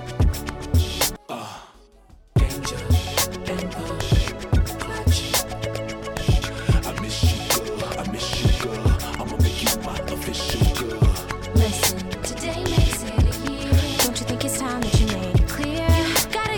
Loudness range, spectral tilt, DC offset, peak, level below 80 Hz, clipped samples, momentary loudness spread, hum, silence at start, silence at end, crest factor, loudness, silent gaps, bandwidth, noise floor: 3 LU; -4.5 dB/octave; under 0.1%; -8 dBFS; -26 dBFS; under 0.1%; 8 LU; none; 0 s; 0 s; 14 dB; -23 LUFS; none; 19 kHz; -50 dBFS